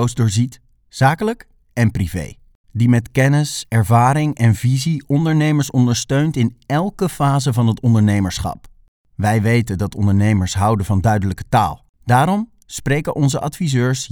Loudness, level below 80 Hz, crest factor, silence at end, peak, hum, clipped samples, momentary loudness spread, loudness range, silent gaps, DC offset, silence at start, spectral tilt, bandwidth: -17 LUFS; -40 dBFS; 16 dB; 0.05 s; 0 dBFS; none; under 0.1%; 9 LU; 2 LU; 2.55-2.64 s, 8.88-9.05 s, 11.89-11.94 s; under 0.1%; 0 s; -6 dB/octave; 18 kHz